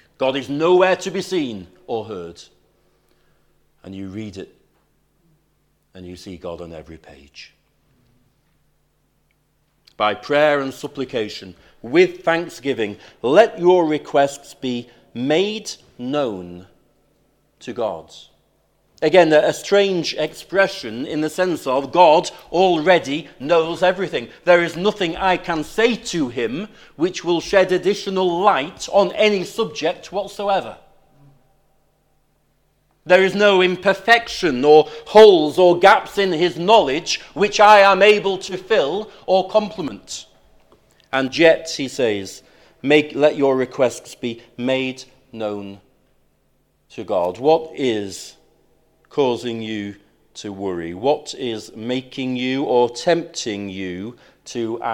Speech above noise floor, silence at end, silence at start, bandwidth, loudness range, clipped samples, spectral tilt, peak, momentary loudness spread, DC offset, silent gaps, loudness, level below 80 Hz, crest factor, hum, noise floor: 46 dB; 0 s; 0.2 s; 17 kHz; 16 LU; under 0.1%; -4.5 dB/octave; 0 dBFS; 19 LU; under 0.1%; none; -18 LUFS; -56 dBFS; 20 dB; none; -64 dBFS